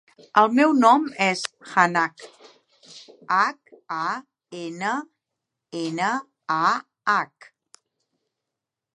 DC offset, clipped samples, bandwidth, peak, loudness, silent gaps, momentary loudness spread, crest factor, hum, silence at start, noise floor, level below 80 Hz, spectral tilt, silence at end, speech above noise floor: under 0.1%; under 0.1%; 11.5 kHz; -2 dBFS; -22 LUFS; none; 17 LU; 22 dB; none; 0.35 s; -86 dBFS; -80 dBFS; -4.5 dB/octave; 1.7 s; 64 dB